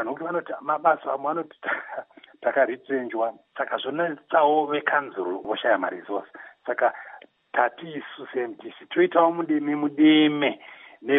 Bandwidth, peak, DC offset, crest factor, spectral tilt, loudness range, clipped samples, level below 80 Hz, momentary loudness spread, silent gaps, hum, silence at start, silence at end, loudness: 3.9 kHz; -6 dBFS; under 0.1%; 18 dB; -2.5 dB/octave; 5 LU; under 0.1%; -82 dBFS; 17 LU; none; none; 0 s; 0 s; -24 LUFS